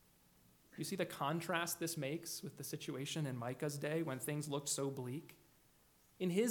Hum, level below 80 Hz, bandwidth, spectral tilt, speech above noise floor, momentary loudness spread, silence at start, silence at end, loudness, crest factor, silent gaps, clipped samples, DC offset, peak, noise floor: none; -80 dBFS; 19 kHz; -4.5 dB/octave; 30 dB; 8 LU; 0.75 s; 0 s; -42 LUFS; 22 dB; none; under 0.1%; under 0.1%; -22 dBFS; -70 dBFS